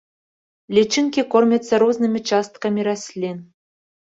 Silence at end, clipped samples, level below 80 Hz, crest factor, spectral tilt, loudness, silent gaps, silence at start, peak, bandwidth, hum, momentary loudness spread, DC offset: 0.7 s; under 0.1%; -64 dBFS; 18 dB; -4.5 dB/octave; -19 LUFS; none; 0.7 s; -2 dBFS; 7.8 kHz; none; 11 LU; under 0.1%